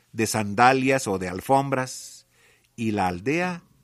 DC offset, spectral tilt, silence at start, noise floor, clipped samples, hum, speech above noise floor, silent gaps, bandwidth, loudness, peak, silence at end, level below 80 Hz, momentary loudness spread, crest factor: under 0.1%; -5 dB/octave; 0.15 s; -60 dBFS; under 0.1%; none; 37 dB; none; 15 kHz; -23 LUFS; -2 dBFS; 0.25 s; -62 dBFS; 12 LU; 22 dB